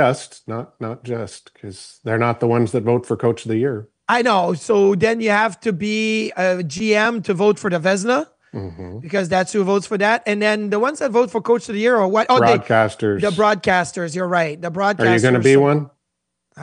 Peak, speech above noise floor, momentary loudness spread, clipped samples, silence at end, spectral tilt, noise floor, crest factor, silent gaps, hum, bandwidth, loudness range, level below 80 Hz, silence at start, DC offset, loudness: -2 dBFS; 59 dB; 15 LU; under 0.1%; 0 s; -5.5 dB/octave; -77 dBFS; 16 dB; none; none; 10.5 kHz; 3 LU; -58 dBFS; 0 s; under 0.1%; -18 LUFS